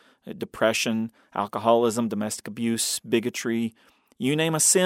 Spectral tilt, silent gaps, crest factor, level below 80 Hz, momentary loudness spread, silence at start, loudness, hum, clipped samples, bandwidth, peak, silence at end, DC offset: -3.5 dB/octave; none; 20 dB; -68 dBFS; 11 LU; 0.25 s; -25 LUFS; none; under 0.1%; 16.5 kHz; -6 dBFS; 0 s; under 0.1%